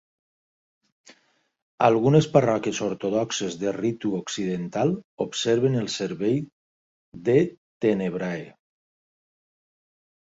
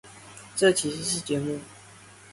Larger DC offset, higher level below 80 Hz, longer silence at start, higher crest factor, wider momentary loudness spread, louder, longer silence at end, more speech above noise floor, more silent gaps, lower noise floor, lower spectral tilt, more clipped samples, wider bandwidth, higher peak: neither; about the same, -62 dBFS vs -62 dBFS; first, 1.8 s vs 0.05 s; about the same, 22 dB vs 22 dB; second, 10 LU vs 23 LU; about the same, -24 LUFS vs -26 LUFS; first, 1.8 s vs 0 s; first, 43 dB vs 24 dB; first, 5.04-5.18 s, 6.53-7.12 s, 7.58-7.80 s vs none; first, -67 dBFS vs -50 dBFS; first, -6 dB/octave vs -3.5 dB/octave; neither; second, 8 kHz vs 11.5 kHz; about the same, -4 dBFS vs -6 dBFS